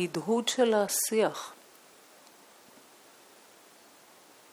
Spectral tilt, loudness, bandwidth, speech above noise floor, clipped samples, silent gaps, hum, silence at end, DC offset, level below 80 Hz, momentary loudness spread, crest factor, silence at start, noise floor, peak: -3 dB/octave; -28 LUFS; over 20 kHz; 29 dB; under 0.1%; none; none; 3 s; under 0.1%; -84 dBFS; 12 LU; 20 dB; 0 s; -57 dBFS; -12 dBFS